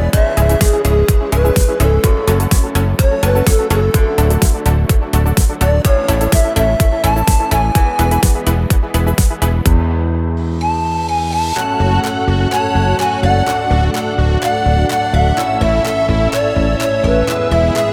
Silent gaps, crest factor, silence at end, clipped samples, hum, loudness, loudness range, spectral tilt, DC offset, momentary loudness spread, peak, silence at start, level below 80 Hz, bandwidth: none; 12 dB; 0 s; under 0.1%; none; -14 LUFS; 2 LU; -6 dB/octave; under 0.1%; 3 LU; 0 dBFS; 0 s; -18 dBFS; 18.5 kHz